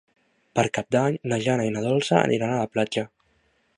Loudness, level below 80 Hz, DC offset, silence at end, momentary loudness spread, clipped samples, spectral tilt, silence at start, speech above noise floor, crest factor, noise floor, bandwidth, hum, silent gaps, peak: -24 LUFS; -62 dBFS; under 0.1%; 0.7 s; 7 LU; under 0.1%; -5.5 dB/octave; 0.55 s; 43 dB; 22 dB; -66 dBFS; 11 kHz; none; none; -2 dBFS